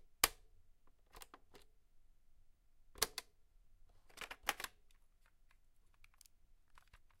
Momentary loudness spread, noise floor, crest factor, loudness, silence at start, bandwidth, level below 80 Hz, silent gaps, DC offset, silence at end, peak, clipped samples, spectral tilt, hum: 23 LU; -69 dBFS; 38 dB; -41 LUFS; 0 s; 16 kHz; -66 dBFS; none; under 0.1%; 0.15 s; -12 dBFS; under 0.1%; 0.5 dB/octave; none